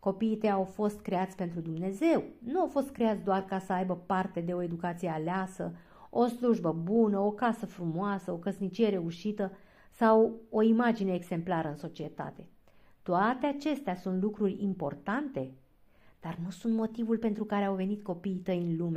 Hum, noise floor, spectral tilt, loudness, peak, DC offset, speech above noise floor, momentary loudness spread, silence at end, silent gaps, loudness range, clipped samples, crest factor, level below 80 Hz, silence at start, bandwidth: none; -60 dBFS; -7.5 dB/octave; -31 LUFS; -12 dBFS; under 0.1%; 30 dB; 11 LU; 0 s; none; 5 LU; under 0.1%; 18 dB; -66 dBFS; 0 s; 14 kHz